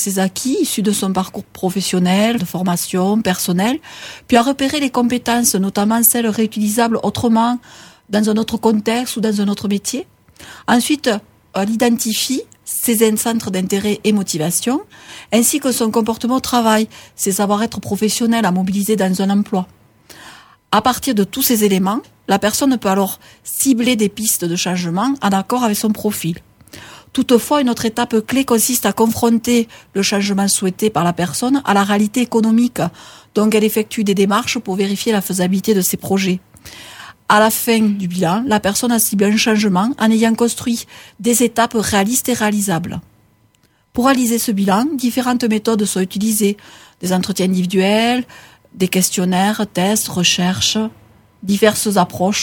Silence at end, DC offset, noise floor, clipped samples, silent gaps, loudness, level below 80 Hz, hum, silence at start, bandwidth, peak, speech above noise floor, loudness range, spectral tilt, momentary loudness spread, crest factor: 0 s; under 0.1%; -56 dBFS; under 0.1%; none; -16 LUFS; -52 dBFS; none; 0 s; 20 kHz; 0 dBFS; 41 dB; 3 LU; -4 dB/octave; 8 LU; 16 dB